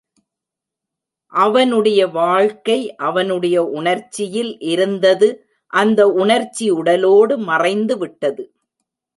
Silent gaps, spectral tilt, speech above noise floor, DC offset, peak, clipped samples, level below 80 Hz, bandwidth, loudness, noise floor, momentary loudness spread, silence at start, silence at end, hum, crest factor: none; -4.5 dB/octave; 69 dB; under 0.1%; -2 dBFS; under 0.1%; -68 dBFS; 11.5 kHz; -16 LUFS; -84 dBFS; 9 LU; 1.3 s; 0.75 s; none; 14 dB